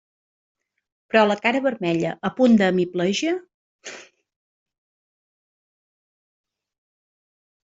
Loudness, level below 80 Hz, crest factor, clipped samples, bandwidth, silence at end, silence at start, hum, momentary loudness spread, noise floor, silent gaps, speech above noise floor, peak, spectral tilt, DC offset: -21 LUFS; -66 dBFS; 22 dB; under 0.1%; 7.8 kHz; 3.6 s; 1.15 s; none; 21 LU; under -90 dBFS; 3.54-3.79 s; over 70 dB; -2 dBFS; -5.5 dB/octave; under 0.1%